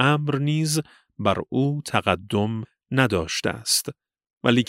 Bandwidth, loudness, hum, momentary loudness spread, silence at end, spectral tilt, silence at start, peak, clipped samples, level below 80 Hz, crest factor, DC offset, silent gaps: 16 kHz; -24 LUFS; none; 5 LU; 0.05 s; -4.5 dB/octave; 0 s; -2 dBFS; under 0.1%; -54 dBFS; 22 dB; under 0.1%; 4.33-4.41 s